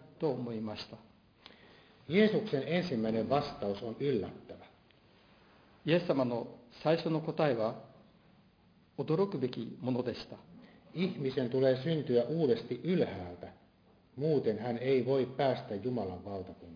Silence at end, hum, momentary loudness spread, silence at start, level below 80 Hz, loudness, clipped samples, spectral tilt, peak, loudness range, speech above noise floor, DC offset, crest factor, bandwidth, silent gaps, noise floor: 0 s; none; 15 LU; 0.05 s; -70 dBFS; -33 LUFS; under 0.1%; -6 dB/octave; -14 dBFS; 3 LU; 32 dB; under 0.1%; 20 dB; 5.2 kHz; none; -65 dBFS